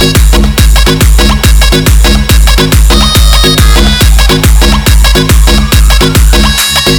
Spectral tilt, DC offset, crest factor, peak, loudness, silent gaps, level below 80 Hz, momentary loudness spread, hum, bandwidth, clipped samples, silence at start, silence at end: -4 dB/octave; under 0.1%; 4 dB; 0 dBFS; -5 LUFS; none; -6 dBFS; 1 LU; none; over 20 kHz; 20%; 0 s; 0 s